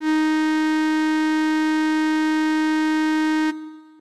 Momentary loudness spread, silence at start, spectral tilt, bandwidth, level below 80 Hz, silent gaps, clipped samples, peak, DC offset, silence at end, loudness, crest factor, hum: 2 LU; 0 s; -2 dB/octave; 11 kHz; -74 dBFS; none; under 0.1%; -16 dBFS; 0.2%; 0.2 s; -20 LUFS; 4 dB; none